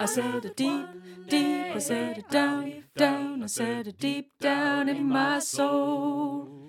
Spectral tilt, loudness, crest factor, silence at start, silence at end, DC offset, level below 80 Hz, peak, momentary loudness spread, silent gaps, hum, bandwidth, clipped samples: -3.5 dB/octave; -28 LUFS; 20 dB; 0 s; 0 s; under 0.1%; -76 dBFS; -8 dBFS; 6 LU; none; none; 16.5 kHz; under 0.1%